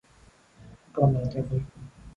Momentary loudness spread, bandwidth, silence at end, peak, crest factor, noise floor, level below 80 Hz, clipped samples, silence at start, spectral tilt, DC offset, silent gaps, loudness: 18 LU; 7.4 kHz; 0.05 s; -8 dBFS; 22 dB; -57 dBFS; -50 dBFS; under 0.1%; 0.6 s; -10 dB/octave; under 0.1%; none; -27 LUFS